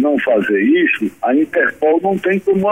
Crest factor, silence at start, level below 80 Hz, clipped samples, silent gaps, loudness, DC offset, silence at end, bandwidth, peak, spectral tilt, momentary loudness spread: 10 dB; 0 s; -56 dBFS; under 0.1%; none; -15 LUFS; 0.1%; 0 s; 13 kHz; -4 dBFS; -7.5 dB/octave; 3 LU